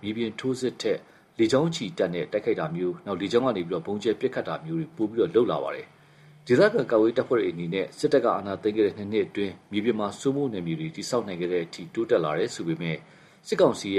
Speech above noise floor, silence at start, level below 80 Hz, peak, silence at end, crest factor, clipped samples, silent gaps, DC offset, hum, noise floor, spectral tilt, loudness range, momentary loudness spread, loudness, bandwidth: 28 dB; 0 s; -66 dBFS; -8 dBFS; 0 s; 18 dB; under 0.1%; none; under 0.1%; none; -53 dBFS; -6 dB/octave; 4 LU; 9 LU; -26 LUFS; 12.5 kHz